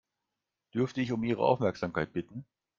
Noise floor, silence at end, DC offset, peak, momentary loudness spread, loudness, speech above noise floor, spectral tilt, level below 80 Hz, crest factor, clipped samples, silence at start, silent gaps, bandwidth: -87 dBFS; 0.35 s; under 0.1%; -12 dBFS; 12 LU; -31 LUFS; 57 dB; -7.5 dB/octave; -64 dBFS; 22 dB; under 0.1%; 0.75 s; none; 7.4 kHz